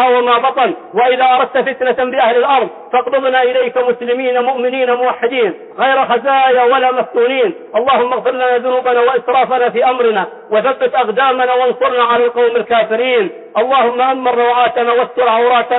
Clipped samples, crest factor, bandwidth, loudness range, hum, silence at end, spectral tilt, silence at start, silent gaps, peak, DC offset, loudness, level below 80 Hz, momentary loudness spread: under 0.1%; 10 dB; 4.1 kHz; 1 LU; none; 0 s; -9 dB/octave; 0 s; none; -2 dBFS; under 0.1%; -13 LUFS; -64 dBFS; 5 LU